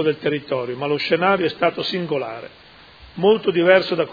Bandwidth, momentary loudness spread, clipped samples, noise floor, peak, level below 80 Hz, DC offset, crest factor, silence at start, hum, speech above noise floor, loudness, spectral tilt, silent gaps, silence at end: 5 kHz; 13 LU; under 0.1%; -45 dBFS; 0 dBFS; -58 dBFS; under 0.1%; 20 dB; 0 s; none; 26 dB; -19 LUFS; -7 dB/octave; none; 0 s